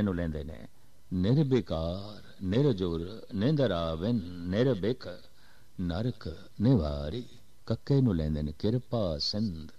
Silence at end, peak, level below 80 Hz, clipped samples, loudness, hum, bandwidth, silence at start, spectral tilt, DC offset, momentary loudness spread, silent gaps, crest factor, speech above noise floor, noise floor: 0.1 s; -14 dBFS; -46 dBFS; under 0.1%; -30 LUFS; none; 9.6 kHz; 0 s; -8 dB/octave; 0.5%; 15 LU; none; 16 dB; 31 dB; -60 dBFS